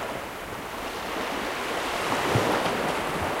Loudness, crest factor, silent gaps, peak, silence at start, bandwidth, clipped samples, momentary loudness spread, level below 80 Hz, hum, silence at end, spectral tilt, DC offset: -28 LUFS; 18 dB; none; -10 dBFS; 0 s; 16 kHz; under 0.1%; 10 LU; -50 dBFS; none; 0 s; -4 dB/octave; under 0.1%